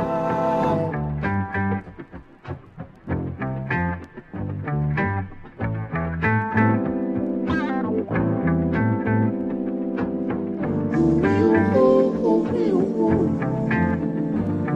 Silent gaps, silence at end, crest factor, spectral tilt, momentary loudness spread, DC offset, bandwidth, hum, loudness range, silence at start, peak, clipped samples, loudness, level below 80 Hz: none; 0 s; 16 dB; -9.5 dB/octave; 13 LU; under 0.1%; 7.8 kHz; none; 8 LU; 0 s; -6 dBFS; under 0.1%; -22 LUFS; -44 dBFS